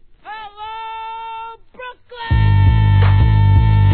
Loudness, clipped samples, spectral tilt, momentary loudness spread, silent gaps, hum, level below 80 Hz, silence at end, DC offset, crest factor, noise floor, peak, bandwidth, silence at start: -13 LUFS; under 0.1%; -11 dB/octave; 21 LU; none; none; -22 dBFS; 0 s; 0.3%; 12 dB; -35 dBFS; -2 dBFS; 4.4 kHz; 0.25 s